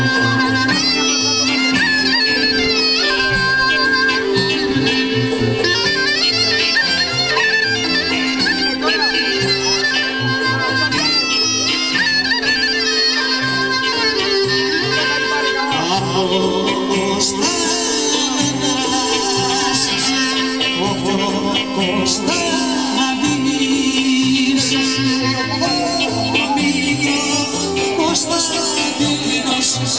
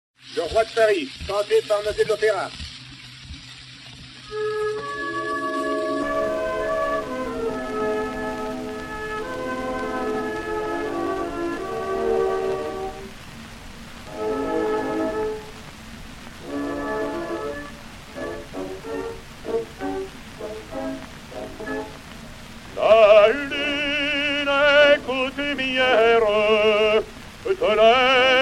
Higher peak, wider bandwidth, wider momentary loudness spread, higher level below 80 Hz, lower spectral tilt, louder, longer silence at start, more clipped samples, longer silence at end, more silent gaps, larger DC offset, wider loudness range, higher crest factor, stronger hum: about the same, -2 dBFS vs -2 dBFS; second, 8 kHz vs 15 kHz; second, 4 LU vs 22 LU; about the same, -46 dBFS vs -46 dBFS; second, -2.5 dB/octave vs -4 dB/octave; first, -15 LUFS vs -22 LUFS; second, 0 s vs 0.25 s; neither; about the same, 0 s vs 0 s; neither; first, 0.3% vs under 0.1%; second, 3 LU vs 13 LU; about the same, 16 dB vs 20 dB; neither